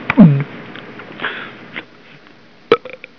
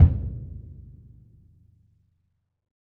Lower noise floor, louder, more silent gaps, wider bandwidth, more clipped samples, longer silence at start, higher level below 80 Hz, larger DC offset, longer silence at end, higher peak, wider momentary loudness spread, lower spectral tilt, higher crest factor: second, -45 dBFS vs -73 dBFS; first, -15 LUFS vs -27 LUFS; neither; first, 5.4 kHz vs 1.9 kHz; first, 0.4% vs under 0.1%; about the same, 0 s vs 0 s; second, -50 dBFS vs -32 dBFS; first, 0.4% vs under 0.1%; second, 0.4 s vs 2.1 s; first, 0 dBFS vs -4 dBFS; about the same, 23 LU vs 24 LU; second, -9.5 dB/octave vs -12 dB/octave; about the same, 18 dB vs 22 dB